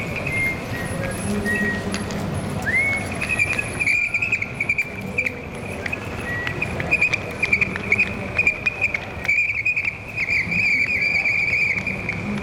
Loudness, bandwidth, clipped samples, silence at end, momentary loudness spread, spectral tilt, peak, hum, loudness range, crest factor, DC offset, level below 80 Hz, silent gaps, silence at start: -20 LUFS; 17 kHz; under 0.1%; 0 s; 9 LU; -4.5 dB/octave; -6 dBFS; none; 4 LU; 18 dB; under 0.1%; -42 dBFS; none; 0 s